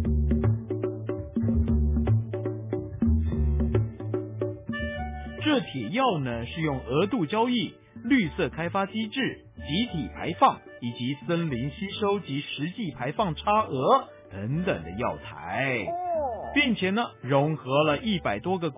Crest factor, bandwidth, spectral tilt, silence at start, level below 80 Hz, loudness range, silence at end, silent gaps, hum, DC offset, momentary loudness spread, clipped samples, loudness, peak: 18 dB; 3.9 kHz; -10.5 dB/octave; 0 s; -36 dBFS; 2 LU; 0 s; none; none; under 0.1%; 9 LU; under 0.1%; -27 LUFS; -8 dBFS